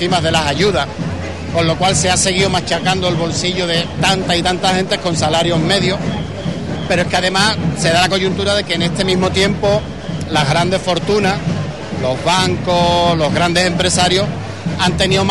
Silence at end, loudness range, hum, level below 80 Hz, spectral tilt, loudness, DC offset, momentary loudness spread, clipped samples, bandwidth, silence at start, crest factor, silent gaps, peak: 0 s; 1 LU; none; -34 dBFS; -4 dB/octave; -15 LUFS; 1%; 8 LU; under 0.1%; 11.5 kHz; 0 s; 14 dB; none; 0 dBFS